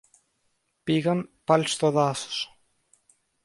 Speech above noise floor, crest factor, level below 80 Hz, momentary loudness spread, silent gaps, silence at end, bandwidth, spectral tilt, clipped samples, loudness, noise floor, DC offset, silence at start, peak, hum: 49 dB; 22 dB; -68 dBFS; 10 LU; none; 1 s; 11.5 kHz; -5 dB/octave; under 0.1%; -25 LUFS; -73 dBFS; under 0.1%; 0.85 s; -6 dBFS; none